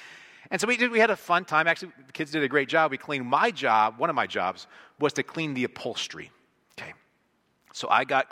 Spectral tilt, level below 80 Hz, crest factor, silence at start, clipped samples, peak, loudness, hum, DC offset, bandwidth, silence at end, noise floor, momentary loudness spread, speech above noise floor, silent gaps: -4 dB/octave; -74 dBFS; 20 dB; 0 s; under 0.1%; -6 dBFS; -25 LUFS; none; under 0.1%; 16 kHz; 0.05 s; -70 dBFS; 19 LU; 44 dB; none